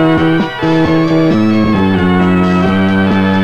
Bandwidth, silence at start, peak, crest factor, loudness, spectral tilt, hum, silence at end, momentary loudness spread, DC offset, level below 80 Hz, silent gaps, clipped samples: 8.2 kHz; 0 s; 0 dBFS; 10 dB; -11 LUFS; -8 dB/octave; none; 0 s; 2 LU; 3%; -36 dBFS; none; under 0.1%